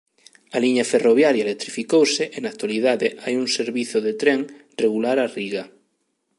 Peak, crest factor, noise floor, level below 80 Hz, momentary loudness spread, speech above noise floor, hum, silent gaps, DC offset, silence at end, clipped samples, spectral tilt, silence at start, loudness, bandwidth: -2 dBFS; 18 dB; -71 dBFS; -76 dBFS; 11 LU; 51 dB; none; none; under 0.1%; 0.7 s; under 0.1%; -3.5 dB/octave; 0.55 s; -21 LUFS; 11.5 kHz